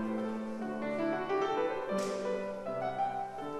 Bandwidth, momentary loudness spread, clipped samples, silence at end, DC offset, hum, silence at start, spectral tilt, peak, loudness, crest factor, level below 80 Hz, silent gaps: 13 kHz; 5 LU; under 0.1%; 0 s; under 0.1%; none; 0 s; -5.5 dB/octave; -20 dBFS; -35 LUFS; 14 dB; -66 dBFS; none